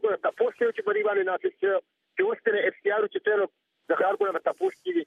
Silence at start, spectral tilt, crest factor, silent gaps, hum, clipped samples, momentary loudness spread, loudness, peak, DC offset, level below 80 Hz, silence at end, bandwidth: 0.05 s; -5.5 dB/octave; 16 dB; none; none; under 0.1%; 4 LU; -27 LUFS; -10 dBFS; under 0.1%; -84 dBFS; 0 s; 5 kHz